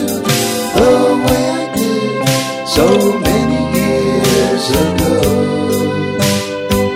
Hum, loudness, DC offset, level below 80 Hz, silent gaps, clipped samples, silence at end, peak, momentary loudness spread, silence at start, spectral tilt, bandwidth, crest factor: none; -13 LUFS; under 0.1%; -32 dBFS; none; under 0.1%; 0 s; 0 dBFS; 5 LU; 0 s; -4.5 dB/octave; 16.5 kHz; 12 dB